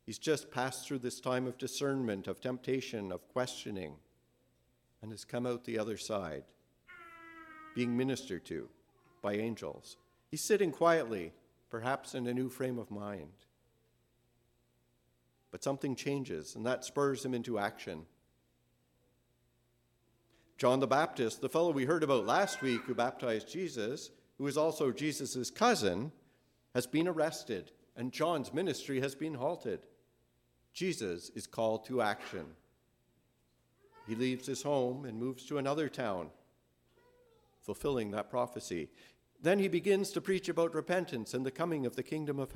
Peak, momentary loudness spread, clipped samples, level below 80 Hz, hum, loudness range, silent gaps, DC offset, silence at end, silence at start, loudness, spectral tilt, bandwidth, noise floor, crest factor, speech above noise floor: -14 dBFS; 15 LU; under 0.1%; -72 dBFS; none; 8 LU; none; under 0.1%; 0 s; 0.05 s; -36 LUFS; -5 dB/octave; 16.5 kHz; -74 dBFS; 22 dB; 39 dB